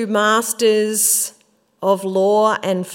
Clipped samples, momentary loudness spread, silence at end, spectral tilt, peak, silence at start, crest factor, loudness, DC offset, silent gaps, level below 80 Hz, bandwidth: under 0.1%; 6 LU; 0 s; -2.5 dB/octave; -2 dBFS; 0 s; 14 dB; -16 LUFS; under 0.1%; none; -76 dBFS; 16.5 kHz